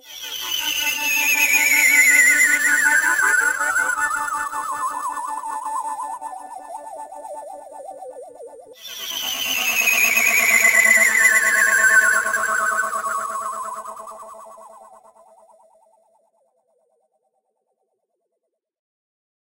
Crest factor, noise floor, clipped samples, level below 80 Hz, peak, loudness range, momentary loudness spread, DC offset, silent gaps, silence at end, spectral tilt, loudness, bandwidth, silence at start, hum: 18 dB; -77 dBFS; under 0.1%; -62 dBFS; -4 dBFS; 18 LU; 23 LU; under 0.1%; none; 4.65 s; 2 dB/octave; -16 LUFS; 16 kHz; 0.05 s; none